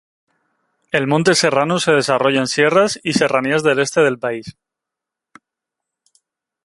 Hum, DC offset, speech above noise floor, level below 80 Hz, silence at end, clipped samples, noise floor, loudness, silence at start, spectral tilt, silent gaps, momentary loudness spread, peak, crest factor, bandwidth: none; under 0.1%; 68 dB; -60 dBFS; 2.15 s; under 0.1%; -84 dBFS; -16 LUFS; 0.95 s; -4 dB/octave; none; 7 LU; -2 dBFS; 16 dB; 11.5 kHz